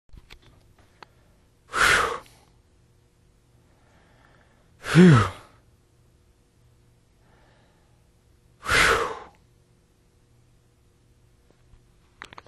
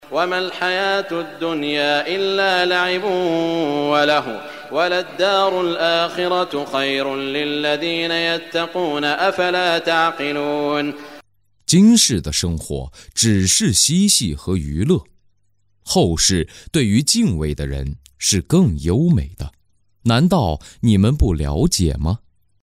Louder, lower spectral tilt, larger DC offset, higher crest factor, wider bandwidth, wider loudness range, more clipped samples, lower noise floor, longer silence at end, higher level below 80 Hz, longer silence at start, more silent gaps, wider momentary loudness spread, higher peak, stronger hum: about the same, -20 LUFS vs -18 LUFS; about the same, -5 dB/octave vs -4 dB/octave; neither; first, 24 dB vs 16 dB; second, 13.5 kHz vs 16 kHz; about the same, 5 LU vs 3 LU; neither; second, -61 dBFS vs -67 dBFS; first, 3.25 s vs 0.45 s; second, -48 dBFS vs -34 dBFS; first, 1.75 s vs 0.05 s; neither; first, 27 LU vs 10 LU; about the same, -2 dBFS vs -2 dBFS; neither